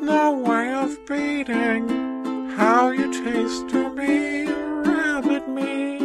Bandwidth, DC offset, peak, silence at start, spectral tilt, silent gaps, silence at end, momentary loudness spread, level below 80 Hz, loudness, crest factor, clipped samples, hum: 12.5 kHz; under 0.1%; -4 dBFS; 0 s; -4.5 dB/octave; none; 0 s; 8 LU; -56 dBFS; -22 LUFS; 18 dB; under 0.1%; none